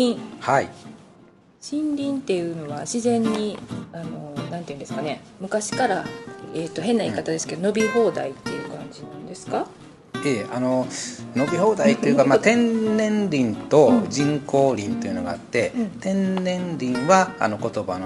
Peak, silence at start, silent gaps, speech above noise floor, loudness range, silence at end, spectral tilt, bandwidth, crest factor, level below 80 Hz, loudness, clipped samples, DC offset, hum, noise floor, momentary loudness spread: -2 dBFS; 0 s; none; 30 dB; 8 LU; 0 s; -5.5 dB/octave; 11.5 kHz; 22 dB; -60 dBFS; -22 LUFS; under 0.1%; under 0.1%; none; -52 dBFS; 16 LU